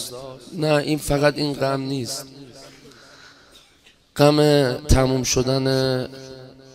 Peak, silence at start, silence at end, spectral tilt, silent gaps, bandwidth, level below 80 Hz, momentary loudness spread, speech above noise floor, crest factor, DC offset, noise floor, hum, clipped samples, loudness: 0 dBFS; 0 s; 0.25 s; -5 dB/octave; none; 16 kHz; -34 dBFS; 20 LU; 35 dB; 20 dB; under 0.1%; -55 dBFS; none; under 0.1%; -20 LUFS